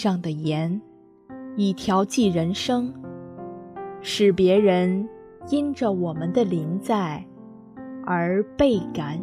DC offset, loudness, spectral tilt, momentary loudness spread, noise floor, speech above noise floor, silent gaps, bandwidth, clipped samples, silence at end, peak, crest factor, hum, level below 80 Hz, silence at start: under 0.1%; -23 LUFS; -6.5 dB/octave; 19 LU; -45 dBFS; 23 dB; none; 14 kHz; under 0.1%; 0 s; -6 dBFS; 18 dB; none; -54 dBFS; 0 s